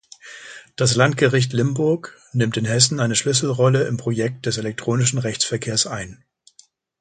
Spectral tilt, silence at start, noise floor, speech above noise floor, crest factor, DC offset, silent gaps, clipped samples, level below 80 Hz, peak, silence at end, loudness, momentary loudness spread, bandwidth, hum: -4 dB/octave; 0.25 s; -55 dBFS; 35 dB; 20 dB; under 0.1%; none; under 0.1%; -56 dBFS; 0 dBFS; 0.85 s; -20 LUFS; 15 LU; 9.6 kHz; none